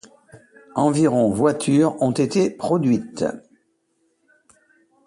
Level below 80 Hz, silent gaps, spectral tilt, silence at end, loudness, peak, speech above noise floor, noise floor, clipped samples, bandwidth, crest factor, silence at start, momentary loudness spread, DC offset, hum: -58 dBFS; none; -6.5 dB/octave; 1.7 s; -20 LUFS; -4 dBFS; 49 dB; -68 dBFS; under 0.1%; 11.5 kHz; 18 dB; 0.35 s; 9 LU; under 0.1%; none